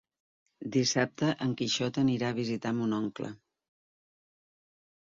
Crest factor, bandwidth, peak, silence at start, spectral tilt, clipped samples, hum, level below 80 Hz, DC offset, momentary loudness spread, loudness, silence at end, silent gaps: 20 dB; 7.6 kHz; -12 dBFS; 0.6 s; -4.5 dB/octave; under 0.1%; none; -70 dBFS; under 0.1%; 9 LU; -30 LUFS; 1.75 s; none